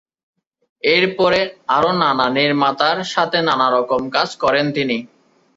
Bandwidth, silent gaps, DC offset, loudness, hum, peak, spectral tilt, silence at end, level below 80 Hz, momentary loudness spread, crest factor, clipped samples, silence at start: 8 kHz; none; under 0.1%; -17 LUFS; none; -2 dBFS; -5 dB/octave; 0.5 s; -56 dBFS; 4 LU; 16 dB; under 0.1%; 0.85 s